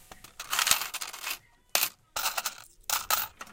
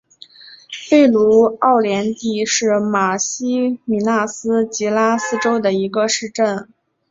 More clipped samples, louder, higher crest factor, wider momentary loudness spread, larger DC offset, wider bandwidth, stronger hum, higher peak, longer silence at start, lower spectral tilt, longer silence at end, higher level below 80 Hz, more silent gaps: neither; second, -29 LUFS vs -16 LUFS; first, 28 dB vs 14 dB; first, 14 LU vs 7 LU; neither; first, 17 kHz vs 7.8 kHz; neither; about the same, -4 dBFS vs -2 dBFS; second, 0 s vs 0.45 s; second, 2 dB/octave vs -4 dB/octave; second, 0 s vs 0.45 s; about the same, -62 dBFS vs -60 dBFS; neither